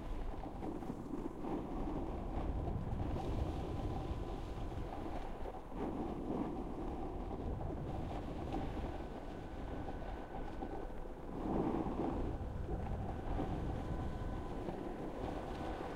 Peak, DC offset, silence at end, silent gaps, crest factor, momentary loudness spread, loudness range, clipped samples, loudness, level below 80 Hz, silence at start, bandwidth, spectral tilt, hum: -24 dBFS; under 0.1%; 0 s; none; 16 dB; 6 LU; 3 LU; under 0.1%; -43 LUFS; -46 dBFS; 0 s; 12.5 kHz; -8 dB/octave; none